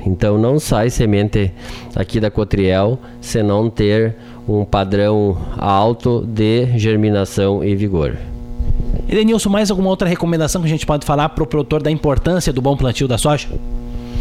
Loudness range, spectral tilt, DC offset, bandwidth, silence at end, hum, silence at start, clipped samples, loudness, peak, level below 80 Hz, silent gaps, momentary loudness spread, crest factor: 1 LU; -6.5 dB/octave; under 0.1%; 15 kHz; 0 s; none; 0 s; under 0.1%; -16 LUFS; -2 dBFS; -26 dBFS; none; 9 LU; 14 dB